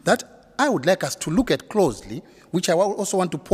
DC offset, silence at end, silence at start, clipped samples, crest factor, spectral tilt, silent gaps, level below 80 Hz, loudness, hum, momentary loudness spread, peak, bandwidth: under 0.1%; 0 s; 0.05 s; under 0.1%; 18 dB; -4.5 dB/octave; none; -48 dBFS; -22 LUFS; none; 14 LU; -4 dBFS; 16 kHz